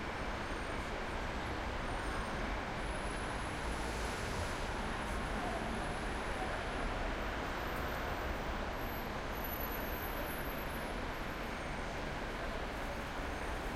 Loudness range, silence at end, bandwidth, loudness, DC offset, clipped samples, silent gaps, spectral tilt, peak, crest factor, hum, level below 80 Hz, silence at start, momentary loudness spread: 1 LU; 0 s; 16.5 kHz; -40 LUFS; under 0.1%; under 0.1%; none; -4.5 dB/octave; -26 dBFS; 14 dB; none; -44 dBFS; 0 s; 2 LU